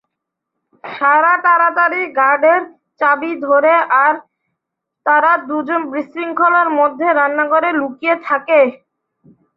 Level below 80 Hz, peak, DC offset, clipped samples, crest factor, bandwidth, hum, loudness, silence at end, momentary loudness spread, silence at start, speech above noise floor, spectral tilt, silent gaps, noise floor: -70 dBFS; -2 dBFS; under 0.1%; under 0.1%; 14 dB; 5.2 kHz; none; -14 LUFS; 0.8 s; 8 LU; 0.85 s; 65 dB; -6.5 dB/octave; none; -79 dBFS